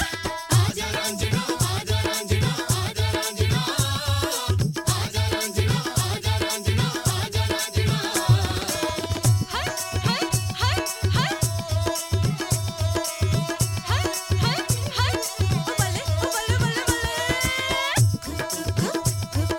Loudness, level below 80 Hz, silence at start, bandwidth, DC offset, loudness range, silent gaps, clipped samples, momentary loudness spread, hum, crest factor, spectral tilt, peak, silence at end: -24 LUFS; -38 dBFS; 0 s; 18 kHz; under 0.1%; 1 LU; none; under 0.1%; 3 LU; none; 18 dB; -4 dB/octave; -6 dBFS; 0 s